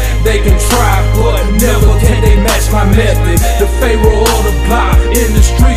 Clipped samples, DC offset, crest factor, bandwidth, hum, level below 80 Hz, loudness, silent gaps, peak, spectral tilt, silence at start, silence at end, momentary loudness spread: 0.2%; 1%; 8 dB; 16 kHz; none; -10 dBFS; -10 LUFS; none; 0 dBFS; -5 dB/octave; 0 s; 0 s; 2 LU